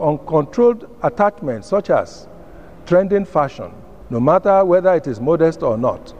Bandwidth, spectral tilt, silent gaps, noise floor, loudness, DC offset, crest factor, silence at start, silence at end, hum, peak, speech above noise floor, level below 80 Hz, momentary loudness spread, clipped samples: 9.6 kHz; -8 dB/octave; none; -40 dBFS; -17 LUFS; 0.7%; 16 dB; 0 s; 0 s; none; -2 dBFS; 23 dB; -46 dBFS; 10 LU; under 0.1%